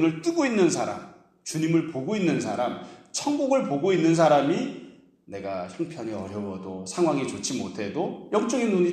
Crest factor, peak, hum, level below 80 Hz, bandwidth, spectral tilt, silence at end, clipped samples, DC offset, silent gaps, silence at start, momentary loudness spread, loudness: 18 dB; -8 dBFS; none; -68 dBFS; 12.5 kHz; -5.5 dB/octave; 0 s; under 0.1%; under 0.1%; none; 0 s; 13 LU; -26 LUFS